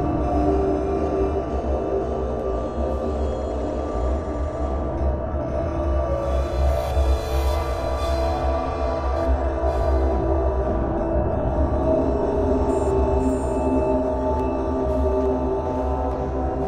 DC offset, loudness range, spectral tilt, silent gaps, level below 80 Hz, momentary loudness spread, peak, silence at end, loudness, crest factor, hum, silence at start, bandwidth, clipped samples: under 0.1%; 4 LU; -8 dB/octave; none; -26 dBFS; 5 LU; -8 dBFS; 0 s; -23 LUFS; 12 dB; none; 0 s; 9.6 kHz; under 0.1%